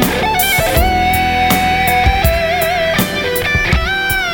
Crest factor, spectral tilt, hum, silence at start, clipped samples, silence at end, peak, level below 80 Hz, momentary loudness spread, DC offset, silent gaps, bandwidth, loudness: 14 dB; -4 dB/octave; none; 0 s; under 0.1%; 0 s; 0 dBFS; -22 dBFS; 2 LU; under 0.1%; none; 17 kHz; -13 LUFS